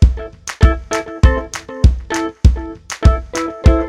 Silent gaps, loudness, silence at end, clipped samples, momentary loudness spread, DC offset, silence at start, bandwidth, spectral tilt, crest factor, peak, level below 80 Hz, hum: none; -16 LUFS; 0 s; 0.3%; 11 LU; under 0.1%; 0 s; 11 kHz; -6 dB/octave; 14 dB; 0 dBFS; -16 dBFS; none